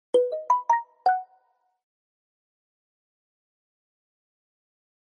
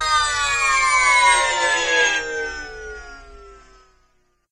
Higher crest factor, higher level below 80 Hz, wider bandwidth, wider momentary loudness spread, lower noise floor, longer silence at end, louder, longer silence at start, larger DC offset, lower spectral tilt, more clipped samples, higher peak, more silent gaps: about the same, 20 dB vs 16 dB; second, under -90 dBFS vs -44 dBFS; second, 9.6 kHz vs 13 kHz; second, 3 LU vs 20 LU; first, -67 dBFS vs -62 dBFS; first, 3.85 s vs 1 s; second, -25 LUFS vs -17 LUFS; first, 0.15 s vs 0 s; neither; first, -2 dB/octave vs 0.5 dB/octave; neither; second, -10 dBFS vs -4 dBFS; neither